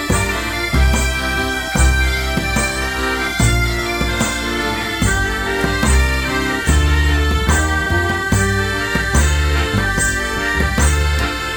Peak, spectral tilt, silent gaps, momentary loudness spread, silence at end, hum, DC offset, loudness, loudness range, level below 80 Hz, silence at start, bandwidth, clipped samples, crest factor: 0 dBFS; -4 dB/octave; none; 3 LU; 0 s; none; under 0.1%; -16 LUFS; 2 LU; -20 dBFS; 0 s; 19 kHz; under 0.1%; 16 dB